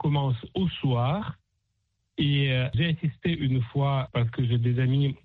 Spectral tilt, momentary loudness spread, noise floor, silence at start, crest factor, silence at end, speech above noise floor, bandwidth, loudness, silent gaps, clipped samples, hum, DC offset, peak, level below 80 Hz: -9.5 dB/octave; 5 LU; -76 dBFS; 0 s; 12 dB; 0.1 s; 51 dB; 4.3 kHz; -26 LUFS; none; under 0.1%; none; under 0.1%; -14 dBFS; -52 dBFS